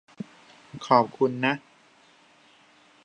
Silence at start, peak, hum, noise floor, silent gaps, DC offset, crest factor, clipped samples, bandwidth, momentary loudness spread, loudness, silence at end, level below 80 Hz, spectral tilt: 0.2 s; -4 dBFS; none; -58 dBFS; none; under 0.1%; 26 dB; under 0.1%; 9.4 kHz; 21 LU; -24 LUFS; 1.45 s; -74 dBFS; -6 dB/octave